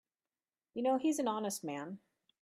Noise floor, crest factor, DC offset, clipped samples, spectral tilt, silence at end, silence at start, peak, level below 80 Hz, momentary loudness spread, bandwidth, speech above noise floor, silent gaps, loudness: under -90 dBFS; 16 dB; under 0.1%; under 0.1%; -4.5 dB/octave; 0.45 s; 0.75 s; -22 dBFS; -86 dBFS; 15 LU; 15.5 kHz; over 55 dB; none; -36 LUFS